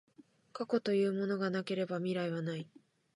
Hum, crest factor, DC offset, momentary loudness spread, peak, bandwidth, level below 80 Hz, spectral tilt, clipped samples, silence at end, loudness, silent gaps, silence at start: none; 18 dB; under 0.1%; 12 LU; -18 dBFS; 11 kHz; -86 dBFS; -7 dB/octave; under 0.1%; 0.5 s; -35 LUFS; none; 0.2 s